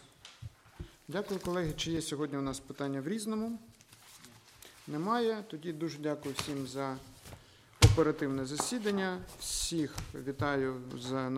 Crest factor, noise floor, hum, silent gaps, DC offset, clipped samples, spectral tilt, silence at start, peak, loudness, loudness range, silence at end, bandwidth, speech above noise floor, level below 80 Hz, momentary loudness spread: 28 dB; -57 dBFS; none; none; under 0.1%; under 0.1%; -5 dB/octave; 0 s; -8 dBFS; -34 LUFS; 6 LU; 0 s; 16 kHz; 22 dB; -48 dBFS; 21 LU